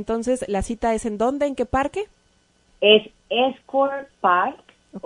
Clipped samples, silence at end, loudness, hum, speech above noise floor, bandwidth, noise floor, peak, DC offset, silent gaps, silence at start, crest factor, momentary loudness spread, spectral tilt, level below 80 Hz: under 0.1%; 0.05 s; -21 LUFS; none; 40 dB; 11 kHz; -61 dBFS; 0 dBFS; under 0.1%; none; 0 s; 22 dB; 10 LU; -4 dB/octave; -44 dBFS